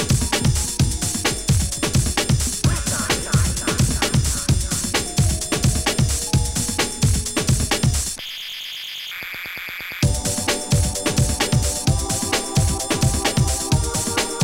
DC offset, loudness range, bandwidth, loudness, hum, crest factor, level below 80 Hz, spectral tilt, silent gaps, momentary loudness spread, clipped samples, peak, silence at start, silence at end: under 0.1%; 3 LU; 16.5 kHz; -20 LUFS; none; 16 dB; -28 dBFS; -3.5 dB/octave; none; 9 LU; under 0.1%; -6 dBFS; 0 s; 0 s